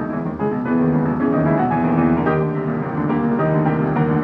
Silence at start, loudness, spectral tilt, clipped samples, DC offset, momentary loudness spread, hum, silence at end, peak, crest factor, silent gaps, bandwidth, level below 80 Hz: 0 s; -19 LUFS; -11 dB/octave; under 0.1%; under 0.1%; 5 LU; none; 0 s; -4 dBFS; 14 dB; none; 4.3 kHz; -44 dBFS